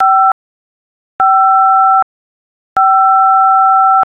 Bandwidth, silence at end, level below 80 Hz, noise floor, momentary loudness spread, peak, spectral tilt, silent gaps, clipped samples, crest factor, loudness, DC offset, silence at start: 3.2 kHz; 0.1 s; -60 dBFS; under -90 dBFS; 7 LU; -2 dBFS; -4.5 dB/octave; 0.32-1.19 s, 2.03-2.76 s; under 0.1%; 8 dB; -9 LUFS; under 0.1%; 0 s